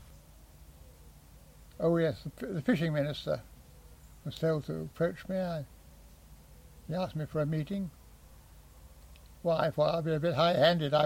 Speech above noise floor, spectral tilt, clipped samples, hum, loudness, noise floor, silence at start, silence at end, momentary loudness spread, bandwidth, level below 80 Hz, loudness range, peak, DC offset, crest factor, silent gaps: 25 dB; -7 dB/octave; under 0.1%; none; -32 LUFS; -55 dBFS; 0 s; 0 s; 14 LU; 16.5 kHz; -56 dBFS; 6 LU; -14 dBFS; under 0.1%; 20 dB; none